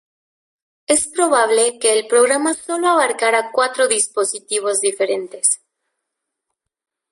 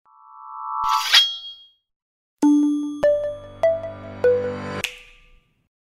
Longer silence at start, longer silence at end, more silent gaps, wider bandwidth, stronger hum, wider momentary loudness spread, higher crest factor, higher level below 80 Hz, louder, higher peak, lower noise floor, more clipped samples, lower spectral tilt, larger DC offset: first, 0.9 s vs 0.35 s; first, 1.55 s vs 0.95 s; second, none vs 1.96-2.37 s; second, 12 kHz vs 16 kHz; neither; second, 6 LU vs 18 LU; second, 16 dB vs 22 dB; second, -66 dBFS vs -54 dBFS; first, -17 LUFS vs -20 LUFS; about the same, -2 dBFS vs -2 dBFS; first, -79 dBFS vs -55 dBFS; neither; second, 0 dB/octave vs -3 dB/octave; neither